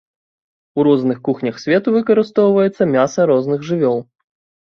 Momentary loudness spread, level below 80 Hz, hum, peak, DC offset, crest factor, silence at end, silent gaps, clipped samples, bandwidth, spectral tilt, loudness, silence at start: 6 LU; -60 dBFS; none; -2 dBFS; under 0.1%; 14 dB; 0.7 s; none; under 0.1%; 7 kHz; -7 dB/octave; -16 LUFS; 0.75 s